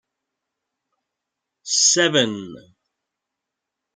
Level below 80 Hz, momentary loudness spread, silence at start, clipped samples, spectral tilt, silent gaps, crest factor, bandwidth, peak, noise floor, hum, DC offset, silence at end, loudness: -70 dBFS; 24 LU; 1.65 s; under 0.1%; -1.5 dB/octave; none; 22 dB; 10.5 kHz; -2 dBFS; -83 dBFS; none; under 0.1%; 1.35 s; -17 LUFS